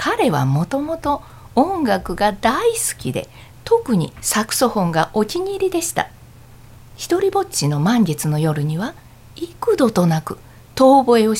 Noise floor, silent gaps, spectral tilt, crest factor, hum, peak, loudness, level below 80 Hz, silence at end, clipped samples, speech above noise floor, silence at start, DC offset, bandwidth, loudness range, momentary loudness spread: -42 dBFS; none; -5 dB/octave; 16 dB; none; -2 dBFS; -18 LUFS; -44 dBFS; 0 s; under 0.1%; 25 dB; 0 s; under 0.1%; 16.5 kHz; 2 LU; 12 LU